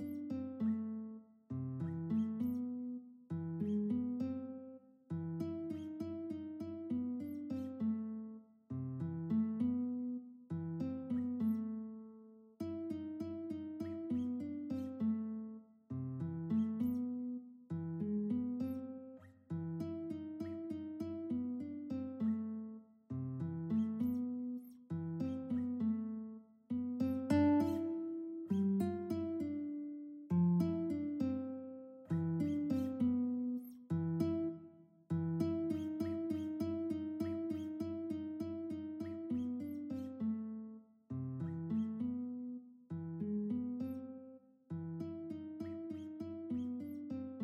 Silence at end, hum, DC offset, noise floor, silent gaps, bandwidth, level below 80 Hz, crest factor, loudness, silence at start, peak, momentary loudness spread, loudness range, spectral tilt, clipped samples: 0 s; none; under 0.1%; -60 dBFS; none; 15 kHz; -72 dBFS; 18 dB; -40 LUFS; 0 s; -22 dBFS; 11 LU; 6 LU; -9.5 dB/octave; under 0.1%